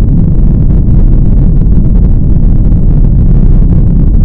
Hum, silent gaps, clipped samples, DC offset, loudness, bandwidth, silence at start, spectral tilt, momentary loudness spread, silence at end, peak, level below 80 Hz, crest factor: none; none; 10%; under 0.1%; -9 LUFS; 1.6 kHz; 0 s; -13 dB/octave; 1 LU; 0 s; 0 dBFS; -6 dBFS; 4 dB